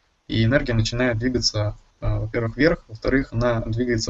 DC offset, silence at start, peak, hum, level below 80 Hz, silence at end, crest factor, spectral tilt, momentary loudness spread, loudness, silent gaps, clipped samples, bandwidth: under 0.1%; 0.3 s; -4 dBFS; none; -34 dBFS; 0 s; 18 dB; -5.5 dB/octave; 7 LU; -23 LUFS; none; under 0.1%; 8 kHz